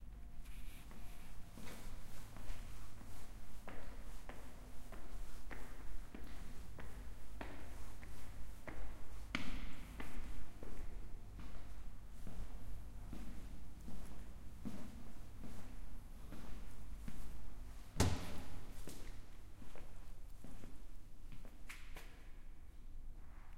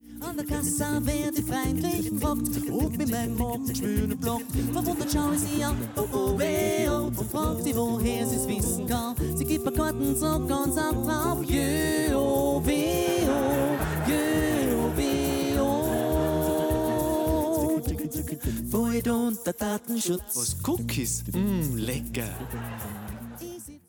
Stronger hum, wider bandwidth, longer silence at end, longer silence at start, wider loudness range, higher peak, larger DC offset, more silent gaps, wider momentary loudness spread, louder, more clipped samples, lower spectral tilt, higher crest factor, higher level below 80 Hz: neither; second, 16 kHz vs 19.5 kHz; about the same, 0 s vs 0.1 s; about the same, 0 s vs 0.05 s; first, 10 LU vs 3 LU; second, -20 dBFS vs -14 dBFS; neither; neither; about the same, 7 LU vs 6 LU; second, -53 LUFS vs -27 LUFS; neither; about the same, -5 dB/octave vs -5 dB/octave; first, 20 dB vs 12 dB; second, -50 dBFS vs -38 dBFS